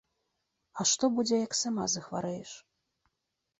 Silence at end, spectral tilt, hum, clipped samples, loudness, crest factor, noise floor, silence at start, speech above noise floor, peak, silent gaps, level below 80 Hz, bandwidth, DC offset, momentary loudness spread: 1 s; -3 dB/octave; none; under 0.1%; -30 LUFS; 18 dB; -84 dBFS; 0.75 s; 54 dB; -16 dBFS; none; -72 dBFS; 8.4 kHz; under 0.1%; 19 LU